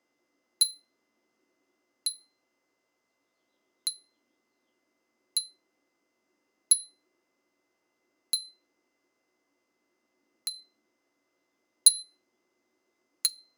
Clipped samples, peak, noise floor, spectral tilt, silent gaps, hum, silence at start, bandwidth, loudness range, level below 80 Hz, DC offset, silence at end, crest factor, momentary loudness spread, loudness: under 0.1%; -4 dBFS; -79 dBFS; 7 dB/octave; none; none; 0.6 s; 19 kHz; 11 LU; under -90 dBFS; under 0.1%; 0.25 s; 32 dB; 18 LU; -27 LUFS